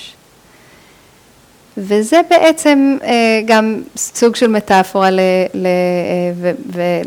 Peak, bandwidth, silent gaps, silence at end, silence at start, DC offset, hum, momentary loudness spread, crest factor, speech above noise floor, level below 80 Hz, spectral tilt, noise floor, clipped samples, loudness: 0 dBFS; 19.5 kHz; none; 0 s; 0 s; under 0.1%; none; 9 LU; 14 dB; 34 dB; -56 dBFS; -4.5 dB/octave; -46 dBFS; under 0.1%; -13 LUFS